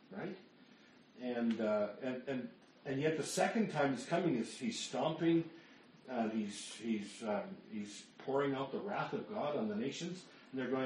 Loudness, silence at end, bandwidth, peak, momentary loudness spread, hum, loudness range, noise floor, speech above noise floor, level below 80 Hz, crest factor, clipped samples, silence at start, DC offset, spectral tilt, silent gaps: -39 LUFS; 0 s; 11.5 kHz; -18 dBFS; 13 LU; none; 4 LU; -63 dBFS; 25 dB; -82 dBFS; 20 dB; under 0.1%; 0.1 s; under 0.1%; -5 dB/octave; none